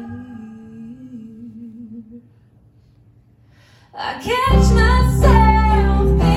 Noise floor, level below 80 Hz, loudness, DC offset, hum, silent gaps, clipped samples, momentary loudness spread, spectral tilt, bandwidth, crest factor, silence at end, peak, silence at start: -51 dBFS; -20 dBFS; -15 LUFS; under 0.1%; none; none; under 0.1%; 24 LU; -6.5 dB/octave; 12.5 kHz; 16 dB; 0 s; -2 dBFS; 0 s